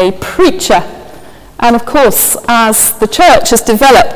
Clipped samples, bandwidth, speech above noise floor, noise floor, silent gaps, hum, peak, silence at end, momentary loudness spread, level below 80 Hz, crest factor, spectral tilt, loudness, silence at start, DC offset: 1%; 16 kHz; 26 dB; -33 dBFS; none; none; 0 dBFS; 0 s; 6 LU; -32 dBFS; 8 dB; -2.5 dB/octave; -8 LUFS; 0 s; under 0.1%